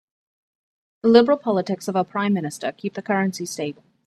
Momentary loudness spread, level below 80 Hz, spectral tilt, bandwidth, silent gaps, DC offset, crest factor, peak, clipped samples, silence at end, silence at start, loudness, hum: 13 LU; -66 dBFS; -5.5 dB/octave; 13.5 kHz; none; under 0.1%; 22 dB; 0 dBFS; under 0.1%; 0.35 s; 1.05 s; -22 LUFS; none